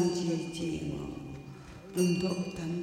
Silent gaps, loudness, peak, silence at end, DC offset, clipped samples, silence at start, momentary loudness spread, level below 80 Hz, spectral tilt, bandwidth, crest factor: none; -33 LUFS; -16 dBFS; 0 s; under 0.1%; under 0.1%; 0 s; 16 LU; -56 dBFS; -6 dB/octave; 16 kHz; 18 dB